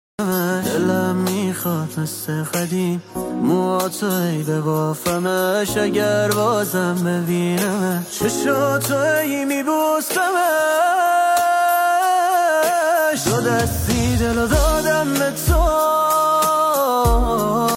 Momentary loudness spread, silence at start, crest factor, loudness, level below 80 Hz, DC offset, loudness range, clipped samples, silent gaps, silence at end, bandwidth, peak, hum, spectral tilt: 5 LU; 0.2 s; 14 dB; -18 LUFS; -30 dBFS; under 0.1%; 4 LU; under 0.1%; none; 0 s; 17 kHz; -4 dBFS; none; -5 dB/octave